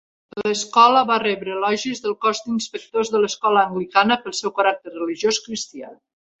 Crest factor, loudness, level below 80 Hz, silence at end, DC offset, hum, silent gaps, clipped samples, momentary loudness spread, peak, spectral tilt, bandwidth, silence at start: 18 dB; -20 LUFS; -66 dBFS; 0.45 s; under 0.1%; none; none; under 0.1%; 13 LU; -2 dBFS; -3 dB/octave; 8.2 kHz; 0.35 s